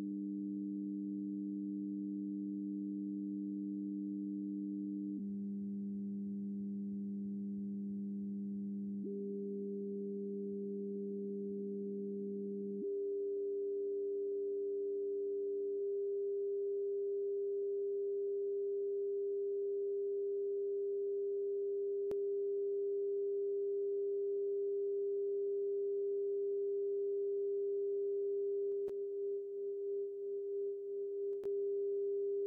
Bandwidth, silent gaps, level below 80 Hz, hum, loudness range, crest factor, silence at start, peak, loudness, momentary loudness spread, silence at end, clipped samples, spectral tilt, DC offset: 0.9 kHz; none; -86 dBFS; none; 5 LU; 6 dB; 0 s; -32 dBFS; -40 LUFS; 5 LU; 0 s; under 0.1%; 5.5 dB/octave; under 0.1%